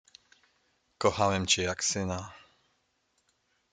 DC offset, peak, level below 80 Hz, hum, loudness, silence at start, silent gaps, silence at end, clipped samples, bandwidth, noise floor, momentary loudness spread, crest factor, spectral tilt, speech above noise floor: under 0.1%; -10 dBFS; -66 dBFS; none; -28 LUFS; 1 s; none; 1.35 s; under 0.1%; 10 kHz; -75 dBFS; 11 LU; 22 dB; -3 dB/octave; 46 dB